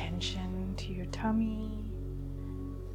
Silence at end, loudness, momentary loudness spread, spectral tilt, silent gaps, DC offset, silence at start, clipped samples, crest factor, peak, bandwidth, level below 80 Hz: 0 s; -36 LUFS; 9 LU; -6 dB/octave; none; under 0.1%; 0 s; under 0.1%; 16 dB; -20 dBFS; 11.5 kHz; -42 dBFS